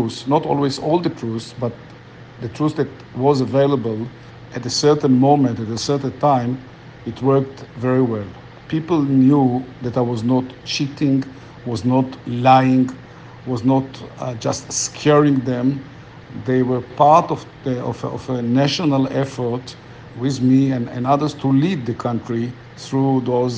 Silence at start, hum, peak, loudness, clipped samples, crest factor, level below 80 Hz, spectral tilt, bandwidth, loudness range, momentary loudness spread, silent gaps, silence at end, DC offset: 0 s; none; 0 dBFS; -19 LUFS; under 0.1%; 18 dB; -54 dBFS; -6 dB/octave; 9.6 kHz; 3 LU; 15 LU; none; 0 s; under 0.1%